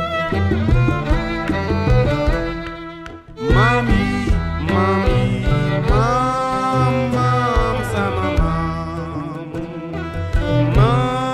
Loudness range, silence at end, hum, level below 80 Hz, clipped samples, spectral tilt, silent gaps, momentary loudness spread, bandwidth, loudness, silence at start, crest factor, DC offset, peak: 3 LU; 0 s; none; -24 dBFS; under 0.1%; -7 dB/octave; none; 12 LU; 12 kHz; -18 LUFS; 0 s; 14 dB; under 0.1%; -4 dBFS